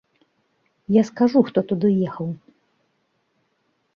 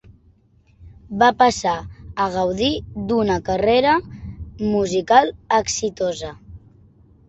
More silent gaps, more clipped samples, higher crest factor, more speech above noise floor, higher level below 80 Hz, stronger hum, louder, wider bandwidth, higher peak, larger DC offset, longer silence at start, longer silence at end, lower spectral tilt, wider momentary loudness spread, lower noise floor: neither; neither; about the same, 18 dB vs 20 dB; first, 50 dB vs 37 dB; second, -64 dBFS vs -44 dBFS; neither; about the same, -20 LUFS vs -19 LUFS; second, 7.2 kHz vs 8.4 kHz; about the same, -4 dBFS vs -2 dBFS; neither; about the same, 0.9 s vs 0.8 s; first, 1.6 s vs 0.7 s; first, -8.5 dB/octave vs -4 dB/octave; about the same, 15 LU vs 16 LU; first, -69 dBFS vs -55 dBFS